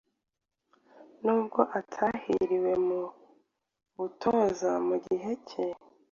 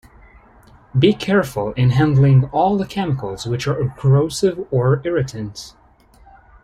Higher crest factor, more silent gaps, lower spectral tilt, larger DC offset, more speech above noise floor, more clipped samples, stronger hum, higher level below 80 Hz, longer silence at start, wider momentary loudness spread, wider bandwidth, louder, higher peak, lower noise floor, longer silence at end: first, 24 dB vs 16 dB; neither; about the same, -6.5 dB/octave vs -7 dB/octave; neither; first, 42 dB vs 33 dB; neither; neither; second, -68 dBFS vs -44 dBFS; about the same, 1 s vs 0.95 s; about the same, 9 LU vs 10 LU; second, 7.2 kHz vs 12.5 kHz; second, -30 LUFS vs -18 LUFS; second, -8 dBFS vs -2 dBFS; first, -71 dBFS vs -49 dBFS; second, 0.4 s vs 0.95 s